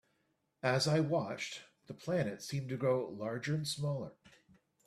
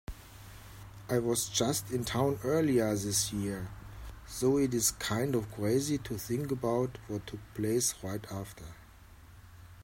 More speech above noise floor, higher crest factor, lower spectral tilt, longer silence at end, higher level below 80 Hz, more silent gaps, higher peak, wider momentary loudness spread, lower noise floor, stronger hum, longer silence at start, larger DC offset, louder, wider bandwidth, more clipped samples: first, 44 dB vs 22 dB; about the same, 22 dB vs 18 dB; about the same, -5.5 dB/octave vs -4.5 dB/octave; first, 0.75 s vs 0 s; second, -72 dBFS vs -54 dBFS; neither; about the same, -16 dBFS vs -14 dBFS; second, 13 LU vs 20 LU; first, -79 dBFS vs -54 dBFS; neither; first, 0.65 s vs 0.1 s; neither; second, -36 LUFS vs -32 LUFS; second, 13.5 kHz vs 16 kHz; neither